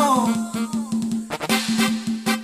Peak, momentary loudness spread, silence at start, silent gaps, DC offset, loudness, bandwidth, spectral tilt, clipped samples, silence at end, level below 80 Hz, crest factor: -6 dBFS; 7 LU; 0 s; none; under 0.1%; -22 LUFS; 15.5 kHz; -3.5 dB/octave; under 0.1%; 0 s; -58 dBFS; 16 dB